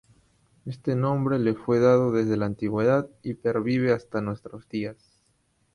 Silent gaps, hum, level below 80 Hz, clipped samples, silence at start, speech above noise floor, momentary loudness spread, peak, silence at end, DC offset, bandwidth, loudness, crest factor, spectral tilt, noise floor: none; none; -58 dBFS; under 0.1%; 0.65 s; 44 dB; 14 LU; -8 dBFS; 0.8 s; under 0.1%; 11 kHz; -25 LUFS; 16 dB; -8.5 dB/octave; -68 dBFS